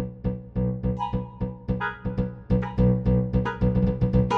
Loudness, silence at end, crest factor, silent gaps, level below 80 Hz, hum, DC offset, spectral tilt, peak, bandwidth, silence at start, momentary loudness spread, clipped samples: -26 LUFS; 0 s; 16 dB; none; -34 dBFS; none; under 0.1%; -9.5 dB/octave; -8 dBFS; 6.4 kHz; 0 s; 8 LU; under 0.1%